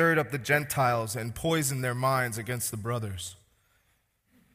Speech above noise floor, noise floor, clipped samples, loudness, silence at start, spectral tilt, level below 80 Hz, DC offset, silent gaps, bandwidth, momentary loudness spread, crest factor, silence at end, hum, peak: 43 dB; -71 dBFS; under 0.1%; -29 LUFS; 0 s; -4.5 dB/octave; -58 dBFS; under 0.1%; none; 15.5 kHz; 8 LU; 18 dB; 1.2 s; none; -10 dBFS